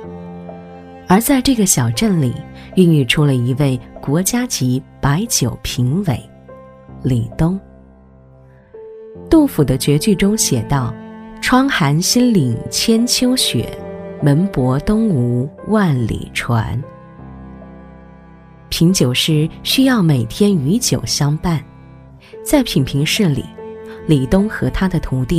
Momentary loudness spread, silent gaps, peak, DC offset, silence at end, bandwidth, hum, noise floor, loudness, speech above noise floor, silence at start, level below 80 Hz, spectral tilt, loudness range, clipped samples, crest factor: 19 LU; none; 0 dBFS; under 0.1%; 0 s; 16 kHz; none; -44 dBFS; -15 LUFS; 29 dB; 0 s; -36 dBFS; -5 dB/octave; 5 LU; under 0.1%; 16 dB